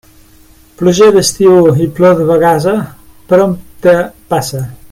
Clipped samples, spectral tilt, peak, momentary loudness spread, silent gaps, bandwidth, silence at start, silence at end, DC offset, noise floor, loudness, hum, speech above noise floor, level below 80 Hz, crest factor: under 0.1%; -5.5 dB/octave; 0 dBFS; 9 LU; none; 16.5 kHz; 0.8 s; 0.05 s; under 0.1%; -42 dBFS; -10 LUFS; none; 33 dB; -42 dBFS; 10 dB